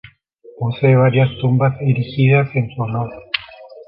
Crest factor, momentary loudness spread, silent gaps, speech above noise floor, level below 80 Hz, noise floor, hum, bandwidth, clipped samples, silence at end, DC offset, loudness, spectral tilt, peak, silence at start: 14 dB; 11 LU; none; 30 dB; -50 dBFS; -45 dBFS; none; 5.2 kHz; under 0.1%; 0.05 s; under 0.1%; -17 LUFS; -10.5 dB/octave; -2 dBFS; 0.55 s